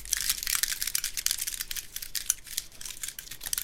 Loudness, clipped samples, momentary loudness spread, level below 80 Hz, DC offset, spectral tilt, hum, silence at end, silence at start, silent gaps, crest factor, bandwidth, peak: -30 LUFS; under 0.1%; 10 LU; -50 dBFS; under 0.1%; 2.5 dB/octave; none; 0 s; 0 s; none; 30 dB; 17 kHz; -2 dBFS